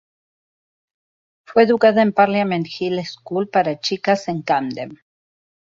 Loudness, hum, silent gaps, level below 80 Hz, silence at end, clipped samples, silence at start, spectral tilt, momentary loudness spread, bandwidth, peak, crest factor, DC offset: -18 LUFS; none; none; -64 dBFS; 0.65 s; under 0.1%; 1.5 s; -6 dB/octave; 12 LU; 7.6 kHz; -2 dBFS; 18 dB; under 0.1%